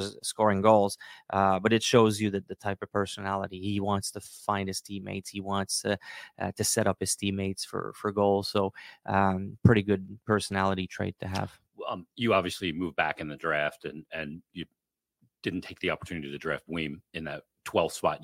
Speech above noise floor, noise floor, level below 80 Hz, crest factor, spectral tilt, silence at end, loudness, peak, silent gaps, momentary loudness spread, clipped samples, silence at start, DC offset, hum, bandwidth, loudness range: 44 dB; -72 dBFS; -60 dBFS; 24 dB; -4.5 dB/octave; 0 s; -29 LUFS; -4 dBFS; none; 14 LU; under 0.1%; 0 s; under 0.1%; none; 16.5 kHz; 7 LU